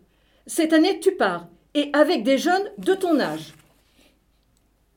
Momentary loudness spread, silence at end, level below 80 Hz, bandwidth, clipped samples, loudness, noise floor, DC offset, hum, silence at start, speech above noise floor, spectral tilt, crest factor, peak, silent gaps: 11 LU; 1.45 s; -64 dBFS; 18 kHz; under 0.1%; -21 LUFS; -63 dBFS; under 0.1%; none; 0.45 s; 43 dB; -4 dB/octave; 18 dB; -4 dBFS; none